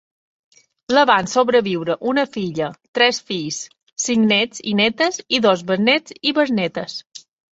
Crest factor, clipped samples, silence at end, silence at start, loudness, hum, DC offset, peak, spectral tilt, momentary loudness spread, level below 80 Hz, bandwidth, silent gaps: 18 dB; under 0.1%; 0.35 s; 0.9 s; -18 LUFS; none; under 0.1%; -2 dBFS; -3.5 dB/octave; 10 LU; -62 dBFS; 8 kHz; 2.88-2.93 s